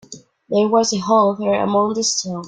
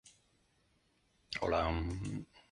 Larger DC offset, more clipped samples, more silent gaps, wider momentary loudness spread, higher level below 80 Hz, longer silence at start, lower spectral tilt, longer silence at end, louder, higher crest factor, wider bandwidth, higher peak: neither; neither; neither; second, 4 LU vs 11 LU; second, -60 dBFS vs -48 dBFS; about the same, 0.1 s vs 0.05 s; second, -4 dB/octave vs -6 dB/octave; second, 0 s vs 0.25 s; first, -17 LUFS vs -37 LUFS; about the same, 16 dB vs 20 dB; second, 9.6 kHz vs 11.5 kHz; first, -2 dBFS vs -20 dBFS